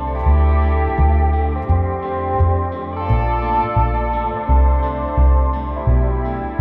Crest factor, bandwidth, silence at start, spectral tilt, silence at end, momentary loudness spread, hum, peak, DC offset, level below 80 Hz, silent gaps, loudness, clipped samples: 10 dB; 4 kHz; 0 s; -11.5 dB/octave; 0 s; 6 LU; none; -6 dBFS; under 0.1%; -18 dBFS; none; -18 LUFS; under 0.1%